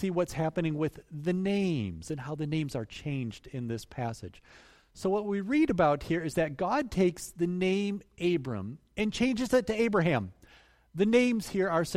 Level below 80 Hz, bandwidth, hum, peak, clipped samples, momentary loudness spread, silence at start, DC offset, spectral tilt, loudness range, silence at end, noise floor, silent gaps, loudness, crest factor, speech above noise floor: -56 dBFS; 16 kHz; none; -12 dBFS; under 0.1%; 11 LU; 0 s; under 0.1%; -6.5 dB/octave; 6 LU; 0 s; -60 dBFS; none; -30 LUFS; 18 dB; 30 dB